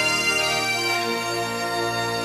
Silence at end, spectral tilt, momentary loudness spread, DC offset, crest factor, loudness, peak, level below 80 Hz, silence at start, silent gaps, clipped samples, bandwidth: 0 s; -2 dB/octave; 6 LU; under 0.1%; 14 dB; -22 LUFS; -10 dBFS; -56 dBFS; 0 s; none; under 0.1%; 15.5 kHz